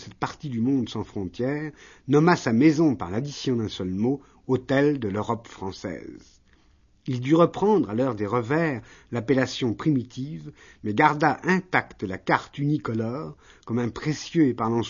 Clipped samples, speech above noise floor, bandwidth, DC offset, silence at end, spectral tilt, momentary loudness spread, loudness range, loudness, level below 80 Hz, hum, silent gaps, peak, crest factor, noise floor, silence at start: under 0.1%; 36 dB; 7.4 kHz; under 0.1%; 0 s; -6.5 dB/octave; 15 LU; 3 LU; -25 LUFS; -56 dBFS; none; none; -2 dBFS; 22 dB; -60 dBFS; 0 s